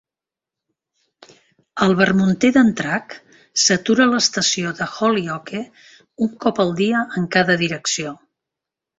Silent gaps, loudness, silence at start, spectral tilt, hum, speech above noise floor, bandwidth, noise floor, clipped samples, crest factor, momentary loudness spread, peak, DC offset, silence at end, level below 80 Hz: none; -18 LUFS; 1.75 s; -3.5 dB/octave; none; 70 dB; 8 kHz; -88 dBFS; under 0.1%; 18 dB; 12 LU; -2 dBFS; under 0.1%; 0.85 s; -58 dBFS